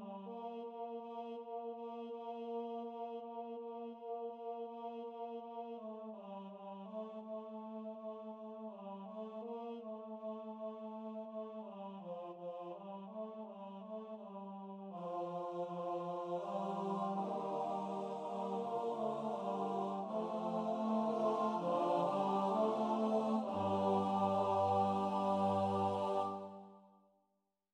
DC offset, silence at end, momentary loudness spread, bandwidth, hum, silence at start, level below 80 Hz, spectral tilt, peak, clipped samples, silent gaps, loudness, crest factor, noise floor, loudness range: under 0.1%; 0.85 s; 14 LU; 9.8 kHz; none; 0 s; under -90 dBFS; -7.5 dB/octave; -24 dBFS; under 0.1%; none; -41 LUFS; 18 dB; -84 dBFS; 13 LU